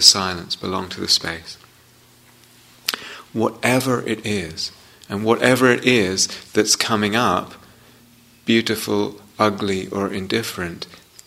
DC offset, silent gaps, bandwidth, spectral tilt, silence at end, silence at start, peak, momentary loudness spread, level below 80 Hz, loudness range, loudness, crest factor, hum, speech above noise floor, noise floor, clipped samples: under 0.1%; none; 16 kHz; -3 dB/octave; 0.3 s; 0 s; 0 dBFS; 14 LU; -56 dBFS; 6 LU; -20 LUFS; 22 dB; none; 32 dB; -51 dBFS; under 0.1%